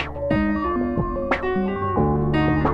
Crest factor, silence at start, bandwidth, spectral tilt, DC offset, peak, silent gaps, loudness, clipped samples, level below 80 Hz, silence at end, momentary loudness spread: 14 dB; 0 s; 6.8 kHz; -9 dB/octave; under 0.1%; -6 dBFS; none; -22 LUFS; under 0.1%; -34 dBFS; 0 s; 3 LU